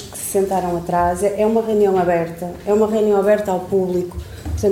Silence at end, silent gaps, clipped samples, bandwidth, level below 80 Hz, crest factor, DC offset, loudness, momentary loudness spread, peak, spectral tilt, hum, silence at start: 0 s; none; under 0.1%; 17 kHz; -38 dBFS; 14 dB; under 0.1%; -18 LUFS; 10 LU; -4 dBFS; -6 dB/octave; none; 0 s